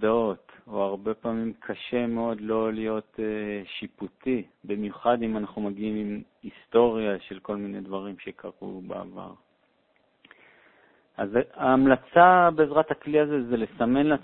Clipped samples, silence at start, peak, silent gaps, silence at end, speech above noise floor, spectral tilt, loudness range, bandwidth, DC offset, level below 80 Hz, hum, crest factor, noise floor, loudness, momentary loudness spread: under 0.1%; 0 s; -4 dBFS; none; 0 s; 42 dB; -10.5 dB/octave; 16 LU; 4.2 kHz; under 0.1%; -58 dBFS; none; 22 dB; -67 dBFS; -25 LUFS; 18 LU